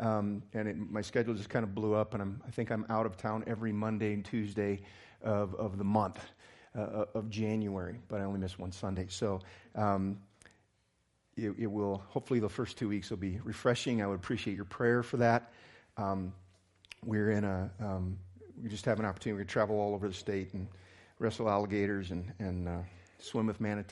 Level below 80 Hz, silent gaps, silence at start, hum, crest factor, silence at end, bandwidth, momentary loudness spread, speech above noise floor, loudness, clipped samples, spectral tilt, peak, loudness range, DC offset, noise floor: -68 dBFS; none; 0 s; none; 22 dB; 0 s; 11.5 kHz; 10 LU; 41 dB; -35 LUFS; under 0.1%; -7 dB/octave; -14 dBFS; 4 LU; under 0.1%; -75 dBFS